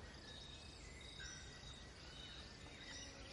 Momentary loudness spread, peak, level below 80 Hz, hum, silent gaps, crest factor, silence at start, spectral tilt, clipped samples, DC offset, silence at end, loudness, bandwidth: 4 LU; -42 dBFS; -62 dBFS; none; none; 14 dB; 0 s; -2.5 dB/octave; under 0.1%; under 0.1%; 0 s; -54 LUFS; 11.5 kHz